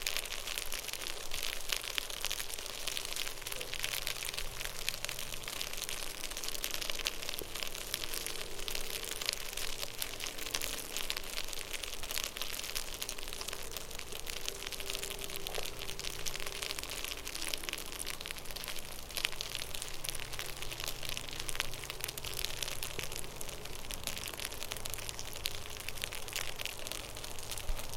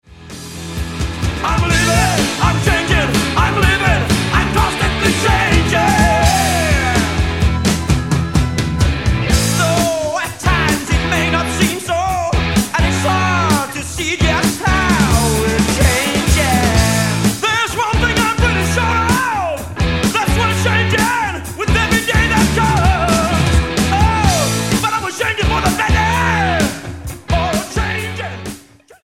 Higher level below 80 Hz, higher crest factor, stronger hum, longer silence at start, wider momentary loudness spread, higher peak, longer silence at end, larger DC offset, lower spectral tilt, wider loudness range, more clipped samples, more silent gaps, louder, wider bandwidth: second, -46 dBFS vs -22 dBFS; first, 30 dB vs 14 dB; neither; about the same, 0 s vs 0.1 s; about the same, 5 LU vs 7 LU; second, -8 dBFS vs 0 dBFS; second, 0 s vs 0.45 s; second, under 0.1% vs 0.4%; second, -1 dB/octave vs -4.5 dB/octave; about the same, 2 LU vs 2 LU; neither; neither; second, -38 LUFS vs -15 LUFS; about the same, 17 kHz vs 16.5 kHz